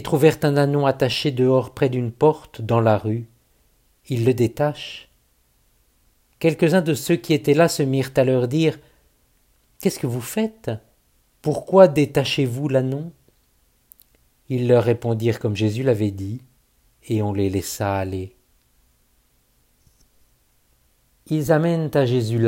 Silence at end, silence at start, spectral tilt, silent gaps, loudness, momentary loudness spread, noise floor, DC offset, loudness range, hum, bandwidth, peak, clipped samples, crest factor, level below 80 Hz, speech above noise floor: 0 s; 0 s; -6.5 dB/octave; none; -20 LUFS; 12 LU; -62 dBFS; under 0.1%; 8 LU; none; 16.5 kHz; 0 dBFS; under 0.1%; 22 dB; -56 dBFS; 43 dB